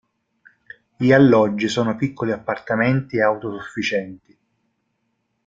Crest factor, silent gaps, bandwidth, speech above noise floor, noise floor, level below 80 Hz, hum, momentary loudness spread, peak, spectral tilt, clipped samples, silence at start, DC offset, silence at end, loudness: 20 dB; none; 7.8 kHz; 53 dB; -72 dBFS; -60 dBFS; none; 12 LU; -2 dBFS; -6.5 dB/octave; under 0.1%; 1 s; under 0.1%; 1.3 s; -19 LUFS